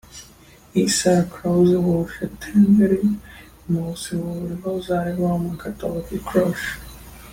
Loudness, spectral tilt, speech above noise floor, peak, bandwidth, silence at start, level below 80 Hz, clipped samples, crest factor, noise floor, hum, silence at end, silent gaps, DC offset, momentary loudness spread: -21 LUFS; -6 dB/octave; 28 dB; -6 dBFS; 16.5 kHz; 0.1 s; -46 dBFS; under 0.1%; 16 dB; -48 dBFS; none; 0 s; none; under 0.1%; 14 LU